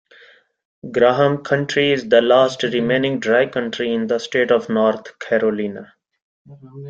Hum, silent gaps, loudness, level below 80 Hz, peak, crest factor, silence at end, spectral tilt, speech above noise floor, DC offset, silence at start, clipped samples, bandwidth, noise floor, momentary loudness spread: none; 6.22-6.45 s; -18 LUFS; -60 dBFS; -2 dBFS; 18 dB; 0 s; -5.5 dB/octave; 32 dB; under 0.1%; 0.85 s; under 0.1%; 8 kHz; -50 dBFS; 10 LU